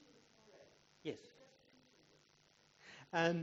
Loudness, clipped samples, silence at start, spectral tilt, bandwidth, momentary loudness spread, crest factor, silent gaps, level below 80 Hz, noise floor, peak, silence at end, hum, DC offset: -42 LUFS; under 0.1%; 0.6 s; -4 dB/octave; 7.6 kHz; 29 LU; 26 dB; none; -86 dBFS; -72 dBFS; -20 dBFS; 0 s; none; under 0.1%